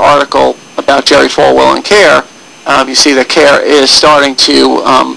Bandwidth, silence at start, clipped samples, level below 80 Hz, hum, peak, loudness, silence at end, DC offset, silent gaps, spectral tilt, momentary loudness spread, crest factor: 11 kHz; 0 s; 5%; -40 dBFS; none; 0 dBFS; -6 LUFS; 0 s; 0.7%; none; -2 dB/octave; 7 LU; 6 dB